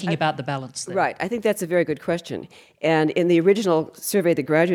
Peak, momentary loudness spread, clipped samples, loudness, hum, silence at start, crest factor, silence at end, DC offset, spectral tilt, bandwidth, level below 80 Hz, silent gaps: -6 dBFS; 10 LU; under 0.1%; -22 LUFS; none; 0 s; 16 dB; 0 s; under 0.1%; -5.5 dB/octave; 18 kHz; -66 dBFS; none